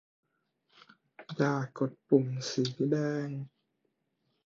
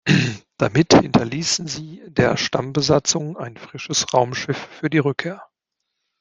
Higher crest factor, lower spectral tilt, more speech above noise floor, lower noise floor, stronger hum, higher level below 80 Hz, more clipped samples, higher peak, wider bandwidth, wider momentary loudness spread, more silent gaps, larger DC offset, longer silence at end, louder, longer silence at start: about the same, 22 dB vs 20 dB; first, -6.5 dB/octave vs -4.5 dB/octave; second, 49 dB vs 59 dB; about the same, -79 dBFS vs -79 dBFS; neither; second, -78 dBFS vs -50 dBFS; neither; second, -12 dBFS vs -2 dBFS; second, 7.8 kHz vs 10 kHz; about the same, 14 LU vs 16 LU; neither; neither; first, 1 s vs 0.75 s; second, -31 LUFS vs -19 LUFS; first, 1.2 s vs 0.05 s